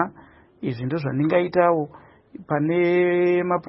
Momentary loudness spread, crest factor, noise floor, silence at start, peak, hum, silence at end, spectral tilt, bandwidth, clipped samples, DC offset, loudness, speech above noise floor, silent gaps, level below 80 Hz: 10 LU; 18 dB; -50 dBFS; 0 s; -6 dBFS; none; 0 s; -12 dB/octave; 5.8 kHz; under 0.1%; under 0.1%; -22 LUFS; 29 dB; none; -62 dBFS